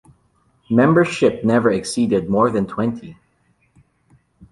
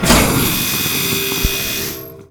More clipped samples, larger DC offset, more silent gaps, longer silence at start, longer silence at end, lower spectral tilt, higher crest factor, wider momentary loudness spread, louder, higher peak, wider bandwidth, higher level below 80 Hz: neither; neither; neither; first, 0.7 s vs 0 s; about the same, 0.05 s vs 0.05 s; first, -6.5 dB/octave vs -3 dB/octave; about the same, 18 dB vs 16 dB; about the same, 8 LU vs 10 LU; second, -18 LUFS vs -15 LUFS; about the same, -2 dBFS vs 0 dBFS; second, 11.5 kHz vs over 20 kHz; second, -52 dBFS vs -28 dBFS